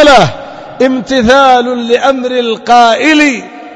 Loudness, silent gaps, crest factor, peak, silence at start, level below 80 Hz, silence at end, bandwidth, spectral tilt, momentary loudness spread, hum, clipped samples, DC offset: -8 LUFS; none; 8 dB; 0 dBFS; 0 s; -36 dBFS; 0.05 s; 11 kHz; -4 dB/octave; 8 LU; none; 3%; under 0.1%